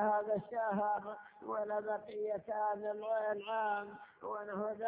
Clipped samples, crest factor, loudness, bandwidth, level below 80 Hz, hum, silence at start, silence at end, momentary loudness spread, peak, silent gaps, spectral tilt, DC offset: under 0.1%; 16 dB; -38 LUFS; 4 kHz; -80 dBFS; none; 0 s; 0 s; 9 LU; -22 dBFS; none; -4.5 dB/octave; under 0.1%